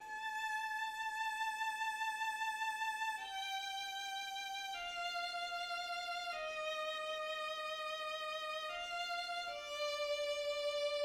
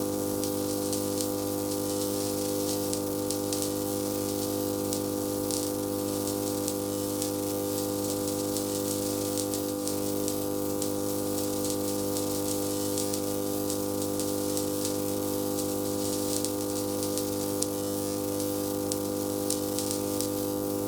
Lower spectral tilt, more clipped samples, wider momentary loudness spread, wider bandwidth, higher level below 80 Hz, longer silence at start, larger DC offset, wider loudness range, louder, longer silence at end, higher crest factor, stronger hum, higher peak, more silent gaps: second, 1.5 dB/octave vs -4 dB/octave; neither; about the same, 3 LU vs 1 LU; second, 16.5 kHz vs over 20 kHz; second, -76 dBFS vs -58 dBFS; about the same, 0 s vs 0 s; neither; about the same, 2 LU vs 0 LU; second, -40 LUFS vs -30 LUFS; about the same, 0 s vs 0 s; second, 14 dB vs 26 dB; second, none vs 50 Hz at -40 dBFS; second, -26 dBFS vs -4 dBFS; neither